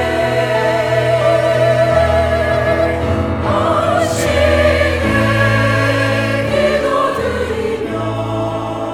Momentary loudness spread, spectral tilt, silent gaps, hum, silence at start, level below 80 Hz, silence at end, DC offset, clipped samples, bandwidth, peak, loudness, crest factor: 7 LU; -6 dB/octave; none; none; 0 s; -30 dBFS; 0 s; under 0.1%; under 0.1%; 16 kHz; 0 dBFS; -14 LUFS; 14 dB